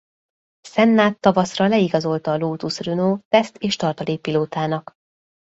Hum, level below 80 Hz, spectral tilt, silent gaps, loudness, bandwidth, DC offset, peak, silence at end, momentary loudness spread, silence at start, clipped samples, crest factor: none; -60 dBFS; -6 dB/octave; 3.25-3.31 s; -20 LUFS; 8 kHz; under 0.1%; -2 dBFS; 0.75 s; 9 LU; 0.65 s; under 0.1%; 18 dB